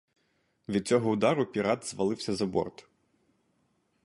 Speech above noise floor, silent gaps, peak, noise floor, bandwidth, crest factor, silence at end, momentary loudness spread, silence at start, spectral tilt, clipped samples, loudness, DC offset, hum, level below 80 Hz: 45 dB; none; -12 dBFS; -73 dBFS; 11.5 kHz; 20 dB; 1.35 s; 7 LU; 0.7 s; -5.5 dB/octave; under 0.1%; -29 LUFS; under 0.1%; none; -64 dBFS